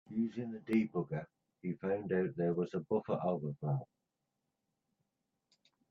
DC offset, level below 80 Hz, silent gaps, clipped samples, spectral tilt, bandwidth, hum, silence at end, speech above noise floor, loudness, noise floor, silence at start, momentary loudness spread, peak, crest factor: under 0.1%; -76 dBFS; none; under 0.1%; -9.5 dB/octave; 7 kHz; none; 2.05 s; 50 dB; -37 LUFS; -87 dBFS; 0.1 s; 10 LU; -20 dBFS; 18 dB